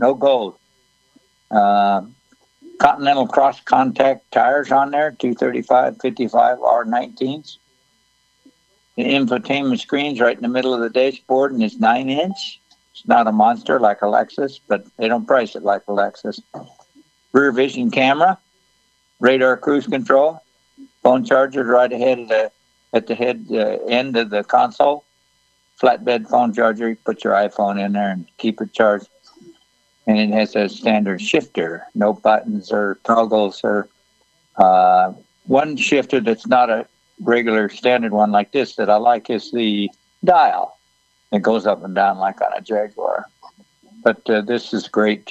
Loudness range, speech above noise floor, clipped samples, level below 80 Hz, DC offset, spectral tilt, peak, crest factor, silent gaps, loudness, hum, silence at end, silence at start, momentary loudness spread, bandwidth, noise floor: 4 LU; 45 dB; under 0.1%; -64 dBFS; under 0.1%; -5.5 dB/octave; 0 dBFS; 18 dB; none; -17 LUFS; none; 0 s; 0 s; 9 LU; 8.4 kHz; -61 dBFS